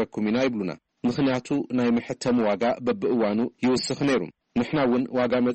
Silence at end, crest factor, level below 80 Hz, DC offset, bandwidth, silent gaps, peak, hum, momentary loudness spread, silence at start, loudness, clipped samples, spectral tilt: 0 s; 10 dB; -58 dBFS; under 0.1%; 8.4 kHz; none; -14 dBFS; none; 5 LU; 0 s; -25 LUFS; under 0.1%; -6 dB/octave